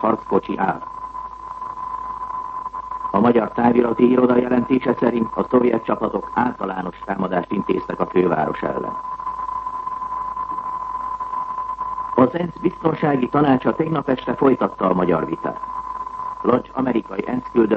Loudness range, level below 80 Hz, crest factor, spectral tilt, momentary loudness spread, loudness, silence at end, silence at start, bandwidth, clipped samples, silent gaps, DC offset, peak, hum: 6 LU; -50 dBFS; 18 dB; -9 dB/octave; 12 LU; -21 LUFS; 0 s; 0 s; 5.8 kHz; under 0.1%; none; under 0.1%; -2 dBFS; none